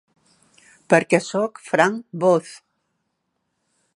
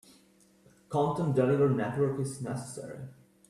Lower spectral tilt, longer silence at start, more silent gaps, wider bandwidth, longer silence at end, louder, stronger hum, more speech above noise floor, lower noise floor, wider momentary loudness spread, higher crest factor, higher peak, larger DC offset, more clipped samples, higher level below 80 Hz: second, -5.5 dB/octave vs -7.5 dB/octave; about the same, 0.9 s vs 0.9 s; neither; second, 11.5 kHz vs 13 kHz; first, 1.4 s vs 0.4 s; first, -20 LUFS vs -30 LUFS; neither; first, 55 dB vs 33 dB; first, -75 dBFS vs -63 dBFS; second, 8 LU vs 17 LU; about the same, 22 dB vs 18 dB; first, 0 dBFS vs -14 dBFS; neither; neither; second, -72 dBFS vs -66 dBFS